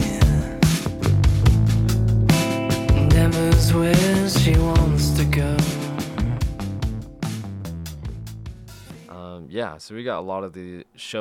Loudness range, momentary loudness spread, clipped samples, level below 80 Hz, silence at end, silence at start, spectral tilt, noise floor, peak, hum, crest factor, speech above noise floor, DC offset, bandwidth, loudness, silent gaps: 14 LU; 19 LU; under 0.1%; -26 dBFS; 0 s; 0 s; -6 dB/octave; -40 dBFS; -4 dBFS; none; 16 dB; 19 dB; under 0.1%; 17 kHz; -20 LUFS; none